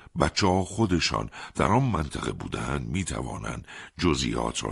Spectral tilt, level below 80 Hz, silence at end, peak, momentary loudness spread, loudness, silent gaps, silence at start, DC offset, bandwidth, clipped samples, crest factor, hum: -5 dB/octave; -42 dBFS; 0 s; -6 dBFS; 11 LU; -27 LUFS; none; 0.15 s; under 0.1%; 11.5 kHz; under 0.1%; 20 dB; none